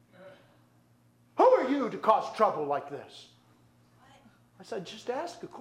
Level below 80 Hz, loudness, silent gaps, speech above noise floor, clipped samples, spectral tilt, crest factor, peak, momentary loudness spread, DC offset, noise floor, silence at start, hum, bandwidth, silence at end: -78 dBFS; -28 LUFS; none; 33 dB; under 0.1%; -5.5 dB/octave; 22 dB; -8 dBFS; 20 LU; under 0.1%; -64 dBFS; 0.2 s; 60 Hz at -65 dBFS; 11 kHz; 0 s